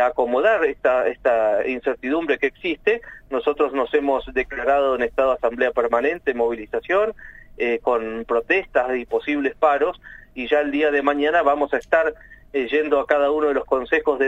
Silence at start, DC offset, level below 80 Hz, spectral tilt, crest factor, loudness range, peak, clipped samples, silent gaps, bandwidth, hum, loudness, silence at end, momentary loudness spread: 0 s; under 0.1%; -48 dBFS; -5.5 dB/octave; 18 dB; 2 LU; -4 dBFS; under 0.1%; none; 7.8 kHz; none; -21 LUFS; 0 s; 6 LU